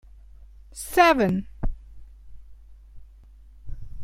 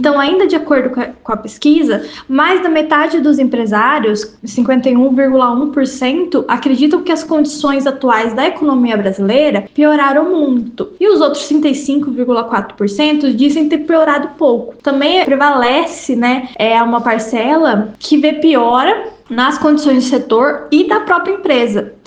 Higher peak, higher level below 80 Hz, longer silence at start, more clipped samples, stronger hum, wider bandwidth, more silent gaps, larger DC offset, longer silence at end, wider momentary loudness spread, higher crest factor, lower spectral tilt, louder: second, -6 dBFS vs 0 dBFS; first, -38 dBFS vs -52 dBFS; first, 0.75 s vs 0 s; neither; neither; first, 16.5 kHz vs 9.4 kHz; neither; neither; second, 0 s vs 0.15 s; first, 27 LU vs 6 LU; first, 22 dB vs 12 dB; about the same, -5 dB/octave vs -5 dB/octave; second, -22 LUFS vs -12 LUFS